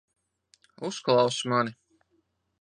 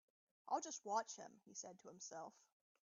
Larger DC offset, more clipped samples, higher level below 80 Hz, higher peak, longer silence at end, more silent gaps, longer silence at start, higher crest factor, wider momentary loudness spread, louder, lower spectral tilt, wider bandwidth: neither; neither; first, -74 dBFS vs under -90 dBFS; first, -10 dBFS vs -28 dBFS; first, 0.85 s vs 0.5 s; neither; first, 0.8 s vs 0.45 s; about the same, 20 dB vs 22 dB; about the same, 12 LU vs 12 LU; first, -27 LUFS vs -49 LUFS; first, -4.5 dB/octave vs -2 dB/octave; first, 10 kHz vs 7.4 kHz